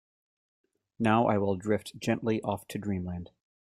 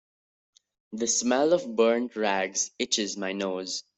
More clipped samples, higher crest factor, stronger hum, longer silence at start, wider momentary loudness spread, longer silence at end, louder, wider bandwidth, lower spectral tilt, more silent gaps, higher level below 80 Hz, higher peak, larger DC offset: neither; about the same, 20 dB vs 18 dB; neither; about the same, 1 s vs 0.9 s; first, 12 LU vs 8 LU; first, 0.45 s vs 0.15 s; second, -30 LUFS vs -26 LUFS; first, 15 kHz vs 8.4 kHz; first, -6.5 dB/octave vs -2 dB/octave; neither; first, -64 dBFS vs -72 dBFS; about the same, -10 dBFS vs -8 dBFS; neither